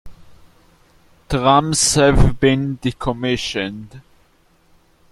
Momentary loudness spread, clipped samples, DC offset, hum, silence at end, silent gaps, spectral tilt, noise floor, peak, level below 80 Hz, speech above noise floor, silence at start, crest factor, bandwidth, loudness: 11 LU; under 0.1%; under 0.1%; none; 1.1 s; none; -4.5 dB/octave; -56 dBFS; 0 dBFS; -28 dBFS; 40 dB; 0.05 s; 18 dB; 13.5 kHz; -17 LUFS